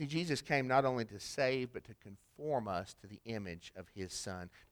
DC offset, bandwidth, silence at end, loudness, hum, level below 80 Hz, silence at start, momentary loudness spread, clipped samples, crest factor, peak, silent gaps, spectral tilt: under 0.1%; over 20 kHz; 0.1 s; -37 LUFS; none; -68 dBFS; 0 s; 19 LU; under 0.1%; 22 dB; -16 dBFS; none; -5 dB/octave